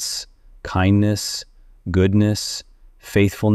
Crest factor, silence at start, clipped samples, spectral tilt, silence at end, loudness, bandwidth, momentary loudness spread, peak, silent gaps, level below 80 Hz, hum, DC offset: 16 dB; 0 s; under 0.1%; -5.5 dB/octave; 0 s; -20 LUFS; 15 kHz; 15 LU; -4 dBFS; none; -42 dBFS; none; under 0.1%